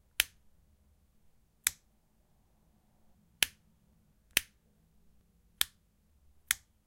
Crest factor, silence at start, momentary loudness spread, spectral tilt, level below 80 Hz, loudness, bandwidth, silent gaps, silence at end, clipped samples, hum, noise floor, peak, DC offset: 38 dB; 0.2 s; 2 LU; 1.5 dB/octave; -66 dBFS; -34 LUFS; 16.5 kHz; none; 0.3 s; under 0.1%; none; -70 dBFS; -4 dBFS; under 0.1%